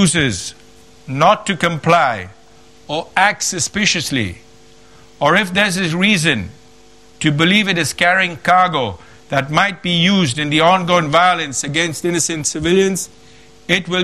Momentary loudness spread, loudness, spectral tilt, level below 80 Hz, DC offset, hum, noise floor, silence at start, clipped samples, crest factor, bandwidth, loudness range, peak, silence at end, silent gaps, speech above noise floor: 11 LU; -15 LUFS; -3.5 dB/octave; -48 dBFS; 0.4%; none; -46 dBFS; 0 s; under 0.1%; 16 dB; 14 kHz; 3 LU; 0 dBFS; 0 s; none; 31 dB